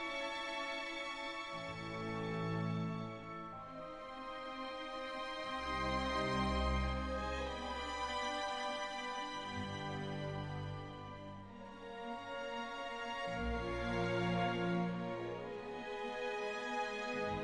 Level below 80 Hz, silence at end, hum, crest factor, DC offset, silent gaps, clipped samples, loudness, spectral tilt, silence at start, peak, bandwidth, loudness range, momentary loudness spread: -52 dBFS; 0 s; none; 16 dB; under 0.1%; none; under 0.1%; -41 LUFS; -5.5 dB/octave; 0 s; -24 dBFS; 11.5 kHz; 6 LU; 11 LU